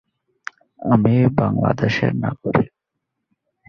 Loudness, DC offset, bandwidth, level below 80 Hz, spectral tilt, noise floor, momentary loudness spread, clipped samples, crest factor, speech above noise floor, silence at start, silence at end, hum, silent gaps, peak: -19 LUFS; under 0.1%; 6.8 kHz; -48 dBFS; -8.5 dB/octave; -79 dBFS; 20 LU; under 0.1%; 18 dB; 61 dB; 0.8 s; 1 s; none; none; -2 dBFS